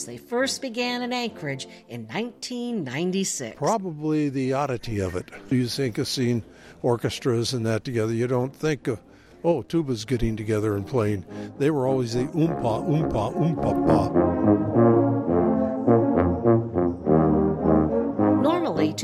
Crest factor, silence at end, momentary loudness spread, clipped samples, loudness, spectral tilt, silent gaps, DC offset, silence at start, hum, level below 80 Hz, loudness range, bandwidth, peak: 16 dB; 0 s; 9 LU; under 0.1%; -24 LUFS; -6 dB/octave; none; under 0.1%; 0 s; none; -46 dBFS; 6 LU; 14.5 kHz; -8 dBFS